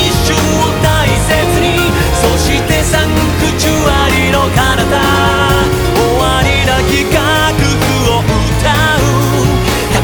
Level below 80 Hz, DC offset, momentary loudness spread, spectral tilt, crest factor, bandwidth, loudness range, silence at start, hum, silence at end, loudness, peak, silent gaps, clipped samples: -20 dBFS; under 0.1%; 2 LU; -4.5 dB/octave; 10 dB; over 20 kHz; 1 LU; 0 s; none; 0 s; -11 LUFS; 0 dBFS; none; under 0.1%